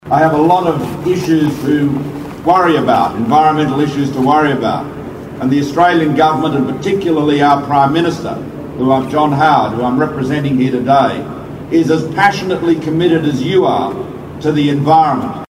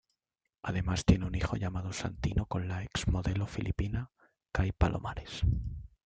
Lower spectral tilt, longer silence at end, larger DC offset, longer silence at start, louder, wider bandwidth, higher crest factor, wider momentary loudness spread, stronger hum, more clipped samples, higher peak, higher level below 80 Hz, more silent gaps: about the same, -7 dB/octave vs -6 dB/octave; second, 0.05 s vs 0.2 s; neither; second, 0.05 s vs 0.65 s; first, -13 LUFS vs -34 LUFS; first, 16 kHz vs 9.2 kHz; second, 12 dB vs 22 dB; about the same, 10 LU vs 9 LU; neither; neither; first, 0 dBFS vs -12 dBFS; about the same, -44 dBFS vs -40 dBFS; neither